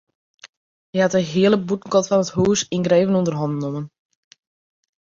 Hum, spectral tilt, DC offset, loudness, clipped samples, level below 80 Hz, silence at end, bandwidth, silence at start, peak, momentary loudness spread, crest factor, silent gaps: none; -5.5 dB/octave; under 0.1%; -19 LUFS; under 0.1%; -56 dBFS; 1.2 s; 7.8 kHz; 0.45 s; -4 dBFS; 10 LU; 18 dB; 0.49-0.93 s